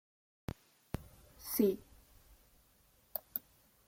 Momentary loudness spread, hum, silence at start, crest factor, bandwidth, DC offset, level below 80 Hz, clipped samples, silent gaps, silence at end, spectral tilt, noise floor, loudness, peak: 18 LU; none; 0.95 s; 26 dB; 16.5 kHz; under 0.1%; -62 dBFS; under 0.1%; none; 0.5 s; -5.5 dB/octave; -69 dBFS; -39 LUFS; -16 dBFS